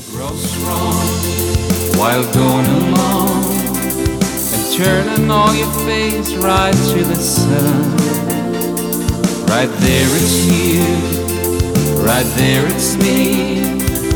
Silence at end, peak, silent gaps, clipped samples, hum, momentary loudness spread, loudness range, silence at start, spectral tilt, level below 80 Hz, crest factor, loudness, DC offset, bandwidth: 0 s; -2 dBFS; none; under 0.1%; none; 5 LU; 1 LU; 0 s; -4.5 dB/octave; -30 dBFS; 12 dB; -14 LUFS; under 0.1%; over 20 kHz